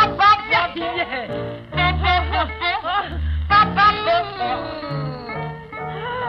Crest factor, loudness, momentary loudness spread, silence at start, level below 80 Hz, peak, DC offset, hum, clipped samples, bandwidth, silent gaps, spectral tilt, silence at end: 16 dB; -19 LUFS; 14 LU; 0 s; -32 dBFS; -4 dBFS; under 0.1%; none; under 0.1%; 6.2 kHz; none; -6.5 dB/octave; 0 s